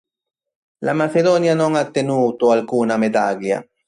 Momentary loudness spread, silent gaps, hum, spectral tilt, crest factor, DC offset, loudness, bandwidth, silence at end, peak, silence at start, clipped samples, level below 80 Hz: 7 LU; none; none; -6 dB/octave; 14 dB; under 0.1%; -18 LUFS; 11 kHz; 0.25 s; -4 dBFS; 0.8 s; under 0.1%; -64 dBFS